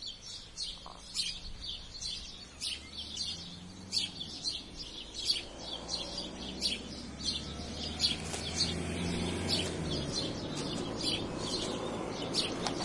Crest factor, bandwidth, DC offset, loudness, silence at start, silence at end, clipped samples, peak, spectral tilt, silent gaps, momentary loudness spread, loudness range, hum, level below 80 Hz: 22 dB; 11.5 kHz; under 0.1%; -35 LUFS; 0 s; 0 s; under 0.1%; -14 dBFS; -3 dB/octave; none; 9 LU; 4 LU; none; -52 dBFS